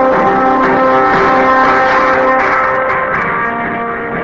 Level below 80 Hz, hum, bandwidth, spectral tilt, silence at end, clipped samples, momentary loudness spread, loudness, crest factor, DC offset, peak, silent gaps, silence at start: -40 dBFS; none; 7.6 kHz; -6 dB/octave; 0 s; under 0.1%; 7 LU; -11 LUFS; 10 dB; under 0.1%; 0 dBFS; none; 0 s